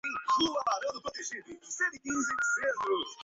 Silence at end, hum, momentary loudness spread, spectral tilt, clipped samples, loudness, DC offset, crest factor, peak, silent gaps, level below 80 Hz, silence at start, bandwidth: 0 s; none; 11 LU; 0 dB/octave; under 0.1%; -31 LUFS; under 0.1%; 16 dB; -16 dBFS; none; -68 dBFS; 0.05 s; 8 kHz